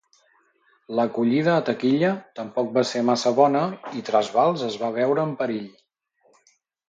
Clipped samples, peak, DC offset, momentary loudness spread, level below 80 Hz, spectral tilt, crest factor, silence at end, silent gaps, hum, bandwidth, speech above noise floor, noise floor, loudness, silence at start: under 0.1%; -4 dBFS; under 0.1%; 10 LU; -72 dBFS; -6 dB/octave; 20 dB; 1.2 s; none; none; 9 kHz; 44 dB; -66 dBFS; -23 LUFS; 0.9 s